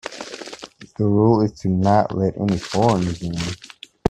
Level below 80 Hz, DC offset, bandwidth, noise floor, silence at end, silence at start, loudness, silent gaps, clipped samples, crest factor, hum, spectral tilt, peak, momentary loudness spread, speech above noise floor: -44 dBFS; under 0.1%; 11.5 kHz; -40 dBFS; 0 s; 0.05 s; -20 LUFS; none; under 0.1%; 18 dB; none; -7 dB/octave; -2 dBFS; 18 LU; 21 dB